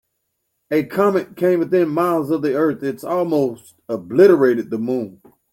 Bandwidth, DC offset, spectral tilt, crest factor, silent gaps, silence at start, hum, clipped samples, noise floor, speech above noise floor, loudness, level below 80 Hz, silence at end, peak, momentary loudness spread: 16.5 kHz; under 0.1%; -7.5 dB/octave; 16 dB; none; 0.7 s; none; under 0.1%; -73 dBFS; 56 dB; -18 LUFS; -64 dBFS; 0.4 s; -2 dBFS; 12 LU